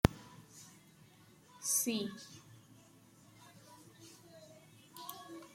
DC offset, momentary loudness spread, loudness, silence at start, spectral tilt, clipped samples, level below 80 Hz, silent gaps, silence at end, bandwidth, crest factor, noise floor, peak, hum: under 0.1%; 28 LU; -37 LUFS; 0.05 s; -4 dB/octave; under 0.1%; -54 dBFS; none; 0.05 s; 16.5 kHz; 34 dB; -62 dBFS; -8 dBFS; none